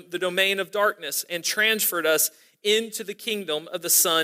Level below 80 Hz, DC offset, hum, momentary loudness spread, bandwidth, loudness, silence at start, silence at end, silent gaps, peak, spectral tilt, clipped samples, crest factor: -82 dBFS; under 0.1%; none; 9 LU; 16 kHz; -23 LUFS; 0.1 s; 0 s; none; -6 dBFS; -0.5 dB/octave; under 0.1%; 18 dB